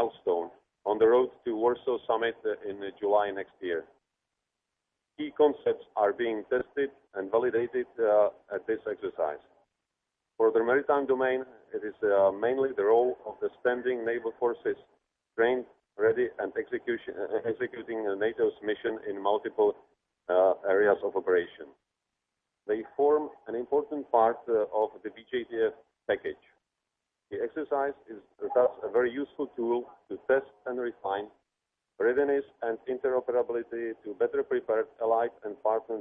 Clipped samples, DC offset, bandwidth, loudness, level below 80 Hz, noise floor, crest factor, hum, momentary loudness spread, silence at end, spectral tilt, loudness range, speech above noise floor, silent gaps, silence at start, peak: under 0.1%; under 0.1%; 3.8 kHz; -29 LUFS; -72 dBFS; -86 dBFS; 18 dB; none; 12 LU; 0 s; -8 dB/octave; 4 LU; 57 dB; none; 0 s; -10 dBFS